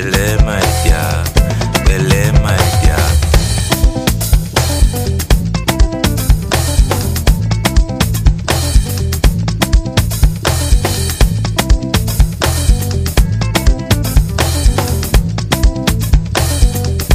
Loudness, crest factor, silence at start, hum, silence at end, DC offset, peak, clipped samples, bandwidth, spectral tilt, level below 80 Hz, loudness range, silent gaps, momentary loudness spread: -14 LUFS; 12 dB; 0 s; none; 0 s; under 0.1%; 0 dBFS; under 0.1%; 15.5 kHz; -4.5 dB/octave; -14 dBFS; 2 LU; none; 3 LU